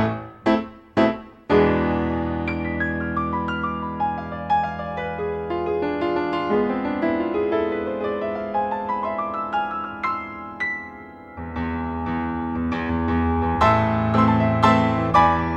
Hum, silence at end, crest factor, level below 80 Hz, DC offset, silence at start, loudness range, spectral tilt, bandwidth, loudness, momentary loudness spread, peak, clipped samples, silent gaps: none; 0 s; 20 dB; -40 dBFS; under 0.1%; 0 s; 7 LU; -8 dB/octave; 8.2 kHz; -22 LUFS; 10 LU; -2 dBFS; under 0.1%; none